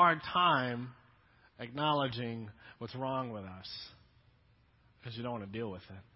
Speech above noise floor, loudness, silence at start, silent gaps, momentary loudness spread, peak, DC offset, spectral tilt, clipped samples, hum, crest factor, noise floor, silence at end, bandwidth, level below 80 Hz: 31 dB; -35 LUFS; 0 s; none; 20 LU; -14 dBFS; under 0.1%; -3 dB/octave; under 0.1%; none; 22 dB; -67 dBFS; 0.15 s; 5.6 kHz; -66 dBFS